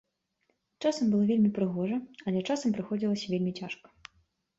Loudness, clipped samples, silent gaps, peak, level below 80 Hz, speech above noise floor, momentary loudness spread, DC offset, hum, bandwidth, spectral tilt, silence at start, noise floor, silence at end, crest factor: -30 LUFS; under 0.1%; none; -16 dBFS; -70 dBFS; 48 dB; 9 LU; under 0.1%; none; 8 kHz; -6.5 dB/octave; 0.8 s; -77 dBFS; 0.85 s; 16 dB